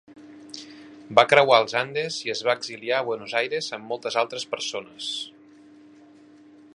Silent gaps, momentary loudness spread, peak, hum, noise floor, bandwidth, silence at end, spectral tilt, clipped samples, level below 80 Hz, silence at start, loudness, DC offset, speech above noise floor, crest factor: none; 22 LU; 0 dBFS; none; -51 dBFS; 11.5 kHz; 1.45 s; -2.5 dB/octave; under 0.1%; -74 dBFS; 0.1 s; -23 LUFS; under 0.1%; 27 dB; 26 dB